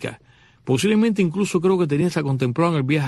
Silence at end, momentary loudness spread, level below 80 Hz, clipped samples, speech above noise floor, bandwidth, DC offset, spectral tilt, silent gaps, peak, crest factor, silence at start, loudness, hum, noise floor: 0 s; 5 LU; -58 dBFS; under 0.1%; 34 dB; 12.5 kHz; under 0.1%; -6.5 dB/octave; none; -6 dBFS; 14 dB; 0 s; -20 LUFS; none; -53 dBFS